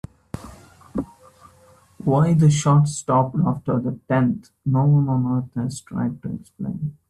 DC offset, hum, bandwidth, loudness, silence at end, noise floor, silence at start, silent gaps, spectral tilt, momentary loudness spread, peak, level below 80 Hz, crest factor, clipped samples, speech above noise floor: under 0.1%; none; 11 kHz; -21 LUFS; 0.15 s; -53 dBFS; 0.35 s; none; -7.5 dB/octave; 16 LU; -6 dBFS; -52 dBFS; 16 dB; under 0.1%; 33 dB